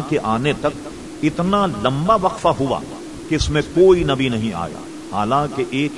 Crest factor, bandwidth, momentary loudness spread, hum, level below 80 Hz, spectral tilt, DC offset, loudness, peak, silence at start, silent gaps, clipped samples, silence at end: 18 dB; 12 kHz; 14 LU; none; -38 dBFS; -6 dB/octave; 0.4%; -19 LUFS; -2 dBFS; 0 s; none; under 0.1%; 0 s